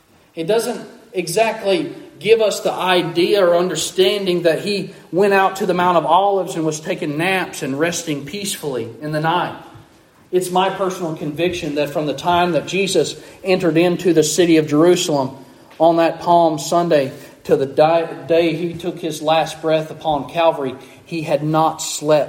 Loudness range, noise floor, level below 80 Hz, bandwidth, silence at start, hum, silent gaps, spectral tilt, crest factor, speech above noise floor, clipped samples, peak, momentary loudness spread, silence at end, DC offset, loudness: 5 LU; -49 dBFS; -58 dBFS; 16.5 kHz; 0.35 s; none; none; -4.5 dB/octave; 16 dB; 32 dB; under 0.1%; -2 dBFS; 11 LU; 0 s; under 0.1%; -18 LUFS